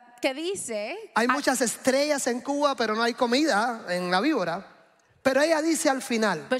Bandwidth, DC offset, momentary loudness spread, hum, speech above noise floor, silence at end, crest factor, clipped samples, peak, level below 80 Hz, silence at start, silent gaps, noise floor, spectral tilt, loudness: 16 kHz; under 0.1%; 8 LU; none; 34 dB; 0 s; 18 dB; under 0.1%; -8 dBFS; -72 dBFS; 0.2 s; none; -59 dBFS; -3 dB/octave; -25 LUFS